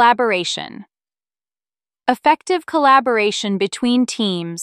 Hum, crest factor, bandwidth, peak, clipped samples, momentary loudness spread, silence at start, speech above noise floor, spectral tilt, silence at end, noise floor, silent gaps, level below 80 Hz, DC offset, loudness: none; 18 dB; 14 kHz; 0 dBFS; under 0.1%; 10 LU; 0 s; over 73 dB; -4 dB/octave; 0 s; under -90 dBFS; none; -68 dBFS; under 0.1%; -17 LUFS